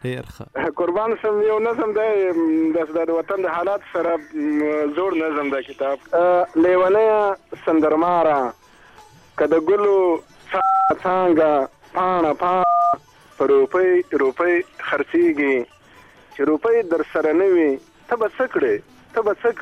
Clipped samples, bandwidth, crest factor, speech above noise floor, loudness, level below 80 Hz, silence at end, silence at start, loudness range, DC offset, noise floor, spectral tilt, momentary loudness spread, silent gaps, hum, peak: under 0.1%; 9 kHz; 12 dB; 30 dB; -19 LUFS; -58 dBFS; 0 s; 0.05 s; 3 LU; under 0.1%; -48 dBFS; -7 dB/octave; 9 LU; none; none; -8 dBFS